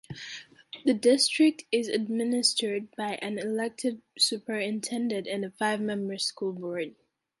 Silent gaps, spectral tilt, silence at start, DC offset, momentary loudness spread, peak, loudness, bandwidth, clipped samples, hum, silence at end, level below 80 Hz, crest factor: none; -3 dB/octave; 0.1 s; under 0.1%; 12 LU; -10 dBFS; -28 LUFS; 12 kHz; under 0.1%; none; 0.5 s; -76 dBFS; 20 dB